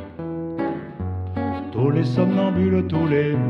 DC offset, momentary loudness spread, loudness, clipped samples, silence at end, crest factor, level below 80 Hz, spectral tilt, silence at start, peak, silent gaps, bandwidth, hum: under 0.1%; 10 LU; -22 LUFS; under 0.1%; 0 s; 16 dB; -54 dBFS; -9.5 dB/octave; 0 s; -6 dBFS; none; 6.2 kHz; none